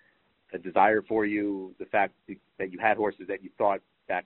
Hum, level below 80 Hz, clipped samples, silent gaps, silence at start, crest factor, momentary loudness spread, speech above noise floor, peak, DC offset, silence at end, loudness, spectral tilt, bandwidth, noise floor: none; -66 dBFS; under 0.1%; none; 0.5 s; 22 dB; 15 LU; 39 dB; -6 dBFS; under 0.1%; 0.05 s; -28 LUFS; -4 dB/octave; 4.2 kHz; -67 dBFS